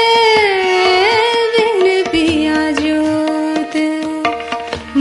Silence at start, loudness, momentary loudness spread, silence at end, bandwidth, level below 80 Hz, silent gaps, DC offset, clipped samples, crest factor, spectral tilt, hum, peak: 0 s; -14 LUFS; 8 LU; 0 s; 11.5 kHz; -44 dBFS; none; under 0.1%; under 0.1%; 12 dB; -3.5 dB/octave; none; 0 dBFS